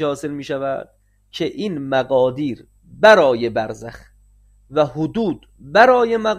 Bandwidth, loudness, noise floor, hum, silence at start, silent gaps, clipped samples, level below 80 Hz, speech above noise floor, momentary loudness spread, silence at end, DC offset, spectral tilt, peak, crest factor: 14 kHz; -17 LUFS; -52 dBFS; 50 Hz at -50 dBFS; 0 s; none; under 0.1%; -52 dBFS; 34 dB; 17 LU; 0 s; under 0.1%; -5.5 dB/octave; 0 dBFS; 18 dB